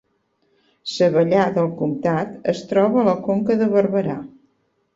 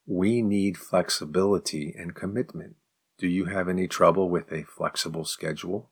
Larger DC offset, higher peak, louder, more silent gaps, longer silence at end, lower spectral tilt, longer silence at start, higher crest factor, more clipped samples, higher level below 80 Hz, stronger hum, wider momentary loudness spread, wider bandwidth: neither; about the same, -4 dBFS vs -6 dBFS; first, -19 LUFS vs -27 LUFS; neither; first, 0.7 s vs 0.1 s; first, -7 dB/octave vs -5 dB/octave; first, 0.85 s vs 0.05 s; about the same, 16 dB vs 20 dB; neither; about the same, -60 dBFS vs -62 dBFS; neither; second, 9 LU vs 12 LU; second, 7.8 kHz vs 19 kHz